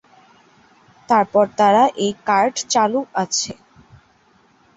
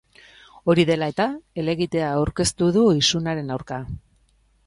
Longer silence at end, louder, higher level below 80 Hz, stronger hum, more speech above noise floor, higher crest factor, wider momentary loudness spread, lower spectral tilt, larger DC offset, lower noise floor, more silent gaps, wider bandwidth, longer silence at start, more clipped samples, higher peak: first, 1.25 s vs 0.7 s; first, -18 LUFS vs -22 LUFS; second, -62 dBFS vs -46 dBFS; neither; about the same, 39 dB vs 40 dB; about the same, 18 dB vs 18 dB; second, 8 LU vs 13 LU; second, -3 dB/octave vs -5 dB/octave; neither; second, -56 dBFS vs -61 dBFS; neither; second, 8.2 kHz vs 11.5 kHz; first, 1.1 s vs 0.65 s; neither; about the same, -2 dBFS vs -4 dBFS